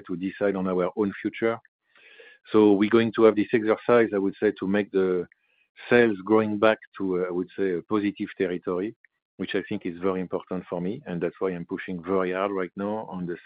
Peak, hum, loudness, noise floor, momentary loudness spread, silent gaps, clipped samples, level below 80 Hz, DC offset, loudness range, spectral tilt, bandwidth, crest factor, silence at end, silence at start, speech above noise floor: -4 dBFS; none; -25 LUFS; -52 dBFS; 12 LU; 1.68-1.79 s, 5.69-5.75 s, 6.87-6.92 s, 8.96-9.04 s, 9.22-9.38 s; under 0.1%; -68 dBFS; under 0.1%; 8 LU; -10.5 dB/octave; 5 kHz; 20 dB; 0.05 s; 0.05 s; 28 dB